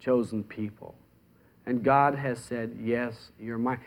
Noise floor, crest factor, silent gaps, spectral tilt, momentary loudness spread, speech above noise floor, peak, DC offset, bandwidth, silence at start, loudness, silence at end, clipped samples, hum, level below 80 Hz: -61 dBFS; 20 dB; none; -7.5 dB/octave; 19 LU; 32 dB; -8 dBFS; under 0.1%; 15.5 kHz; 0 s; -29 LUFS; 0 s; under 0.1%; none; -64 dBFS